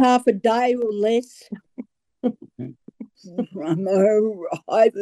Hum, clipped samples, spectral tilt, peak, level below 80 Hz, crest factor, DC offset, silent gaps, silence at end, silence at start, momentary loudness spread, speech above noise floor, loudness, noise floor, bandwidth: none; under 0.1%; -6 dB/octave; -6 dBFS; -72 dBFS; 16 dB; under 0.1%; none; 0 s; 0 s; 22 LU; 22 dB; -21 LUFS; -42 dBFS; 12 kHz